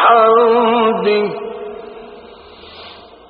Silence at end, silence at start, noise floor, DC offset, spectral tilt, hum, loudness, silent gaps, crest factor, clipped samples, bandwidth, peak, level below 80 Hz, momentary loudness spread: 0.35 s; 0 s; -38 dBFS; under 0.1%; -2.5 dB/octave; none; -12 LUFS; none; 14 dB; under 0.1%; 5.2 kHz; 0 dBFS; -58 dBFS; 25 LU